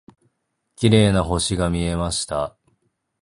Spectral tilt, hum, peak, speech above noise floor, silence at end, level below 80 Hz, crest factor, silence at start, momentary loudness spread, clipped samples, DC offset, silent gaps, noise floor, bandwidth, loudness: -5 dB/octave; none; -2 dBFS; 54 dB; 0.75 s; -36 dBFS; 20 dB; 0.8 s; 10 LU; under 0.1%; under 0.1%; none; -73 dBFS; 11.5 kHz; -20 LUFS